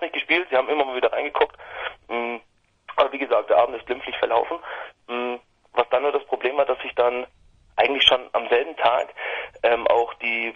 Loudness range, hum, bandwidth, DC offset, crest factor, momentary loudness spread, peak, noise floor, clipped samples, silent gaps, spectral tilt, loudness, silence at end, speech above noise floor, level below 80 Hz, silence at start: 4 LU; none; 9.8 kHz; under 0.1%; 22 dB; 13 LU; 0 dBFS; -57 dBFS; under 0.1%; none; -3.5 dB/octave; -22 LUFS; 0.05 s; 35 dB; -58 dBFS; 0 s